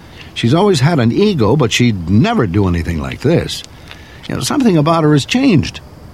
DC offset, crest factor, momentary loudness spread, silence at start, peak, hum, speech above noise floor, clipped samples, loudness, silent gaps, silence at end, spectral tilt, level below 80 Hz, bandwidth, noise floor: 0.2%; 12 dB; 13 LU; 0.15 s; -2 dBFS; none; 22 dB; under 0.1%; -13 LUFS; none; 0 s; -6 dB/octave; -38 dBFS; 15 kHz; -35 dBFS